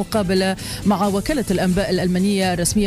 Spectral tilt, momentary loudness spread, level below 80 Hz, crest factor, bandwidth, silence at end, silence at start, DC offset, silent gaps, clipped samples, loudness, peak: -5 dB/octave; 3 LU; -36 dBFS; 12 dB; 15.5 kHz; 0 s; 0 s; under 0.1%; none; under 0.1%; -19 LUFS; -8 dBFS